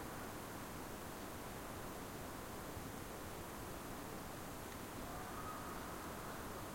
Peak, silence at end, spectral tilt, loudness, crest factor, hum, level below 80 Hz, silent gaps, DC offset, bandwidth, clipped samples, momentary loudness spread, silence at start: -34 dBFS; 0 s; -4 dB/octave; -49 LUFS; 14 dB; none; -60 dBFS; none; under 0.1%; 16.5 kHz; under 0.1%; 2 LU; 0 s